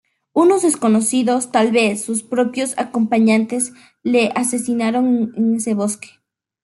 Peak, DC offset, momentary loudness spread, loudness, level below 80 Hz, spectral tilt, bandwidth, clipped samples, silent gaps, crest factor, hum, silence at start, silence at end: -2 dBFS; under 0.1%; 8 LU; -17 LUFS; -66 dBFS; -4 dB/octave; 12 kHz; under 0.1%; none; 14 dB; none; 0.35 s; 0.6 s